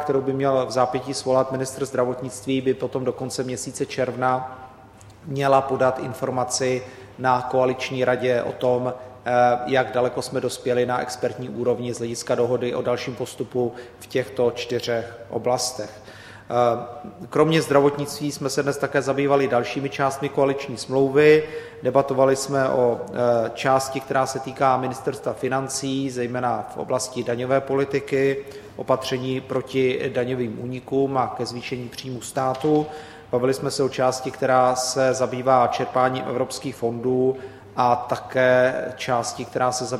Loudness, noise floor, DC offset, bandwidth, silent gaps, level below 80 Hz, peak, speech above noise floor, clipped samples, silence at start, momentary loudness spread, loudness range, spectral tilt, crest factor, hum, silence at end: -23 LUFS; -46 dBFS; under 0.1%; 15.5 kHz; none; -58 dBFS; -2 dBFS; 24 dB; under 0.1%; 0 s; 10 LU; 5 LU; -5 dB/octave; 20 dB; none; 0 s